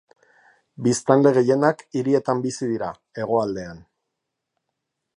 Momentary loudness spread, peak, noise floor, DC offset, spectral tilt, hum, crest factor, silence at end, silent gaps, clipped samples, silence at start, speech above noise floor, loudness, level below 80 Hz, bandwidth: 14 LU; -2 dBFS; -81 dBFS; under 0.1%; -6 dB/octave; none; 22 dB; 1.4 s; none; under 0.1%; 0.8 s; 60 dB; -21 LUFS; -62 dBFS; 11 kHz